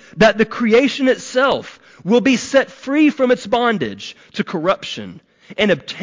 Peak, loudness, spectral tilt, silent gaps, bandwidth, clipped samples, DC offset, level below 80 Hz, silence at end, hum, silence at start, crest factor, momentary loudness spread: -4 dBFS; -16 LUFS; -5 dB/octave; none; 7.6 kHz; under 0.1%; under 0.1%; -54 dBFS; 0 s; none; 0.15 s; 14 dB; 15 LU